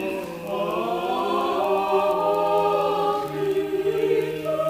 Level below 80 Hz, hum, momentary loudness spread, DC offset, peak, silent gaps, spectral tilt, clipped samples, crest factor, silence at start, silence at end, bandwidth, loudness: -58 dBFS; none; 5 LU; under 0.1%; -10 dBFS; none; -5.5 dB/octave; under 0.1%; 14 dB; 0 s; 0 s; 15.5 kHz; -23 LUFS